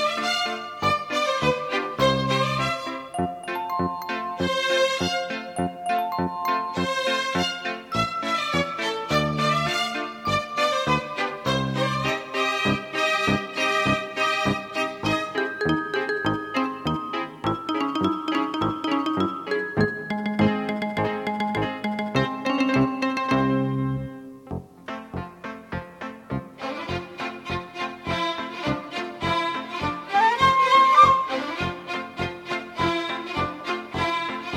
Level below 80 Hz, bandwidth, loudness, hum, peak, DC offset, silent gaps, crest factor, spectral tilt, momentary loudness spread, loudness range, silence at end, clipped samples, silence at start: -50 dBFS; 17 kHz; -24 LUFS; none; -4 dBFS; under 0.1%; none; 20 dB; -5 dB/octave; 10 LU; 8 LU; 0 s; under 0.1%; 0 s